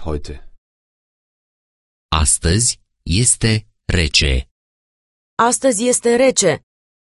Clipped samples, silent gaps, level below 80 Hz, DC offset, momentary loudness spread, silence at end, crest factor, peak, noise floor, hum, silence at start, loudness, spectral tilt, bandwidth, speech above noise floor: under 0.1%; 0.58-2.09 s, 4.51-5.37 s; -28 dBFS; under 0.1%; 13 LU; 0.45 s; 18 dB; -2 dBFS; under -90 dBFS; none; 0 s; -15 LUFS; -3.5 dB/octave; 12 kHz; over 74 dB